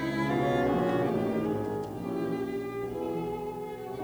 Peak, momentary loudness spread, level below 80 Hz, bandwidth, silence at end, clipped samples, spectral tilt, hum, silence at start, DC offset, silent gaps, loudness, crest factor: -14 dBFS; 8 LU; -54 dBFS; over 20 kHz; 0 s; under 0.1%; -7.5 dB/octave; none; 0 s; under 0.1%; none; -31 LUFS; 16 dB